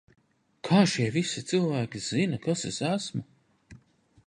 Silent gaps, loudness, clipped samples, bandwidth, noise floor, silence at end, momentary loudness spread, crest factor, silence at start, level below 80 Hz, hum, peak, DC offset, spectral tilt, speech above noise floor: none; -28 LUFS; under 0.1%; 11 kHz; -59 dBFS; 0.5 s; 9 LU; 20 dB; 0.65 s; -66 dBFS; none; -8 dBFS; under 0.1%; -5 dB/octave; 32 dB